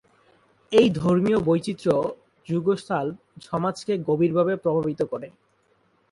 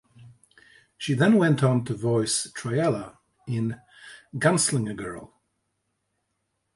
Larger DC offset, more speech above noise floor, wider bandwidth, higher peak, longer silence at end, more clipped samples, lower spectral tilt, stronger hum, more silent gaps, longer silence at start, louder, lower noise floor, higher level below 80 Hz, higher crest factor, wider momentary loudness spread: neither; second, 42 dB vs 53 dB; about the same, 11.5 kHz vs 11.5 kHz; about the same, -4 dBFS vs -6 dBFS; second, 0.85 s vs 1.5 s; neither; first, -7 dB/octave vs -5 dB/octave; neither; neither; first, 0.7 s vs 0.2 s; about the same, -24 LUFS vs -24 LUFS; second, -65 dBFS vs -77 dBFS; about the same, -58 dBFS vs -62 dBFS; about the same, 20 dB vs 20 dB; second, 12 LU vs 17 LU